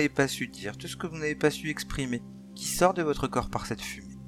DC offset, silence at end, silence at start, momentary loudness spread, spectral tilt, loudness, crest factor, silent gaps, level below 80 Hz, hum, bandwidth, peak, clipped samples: under 0.1%; 0 s; 0 s; 12 LU; -4.5 dB/octave; -30 LUFS; 22 dB; none; -48 dBFS; none; 17 kHz; -8 dBFS; under 0.1%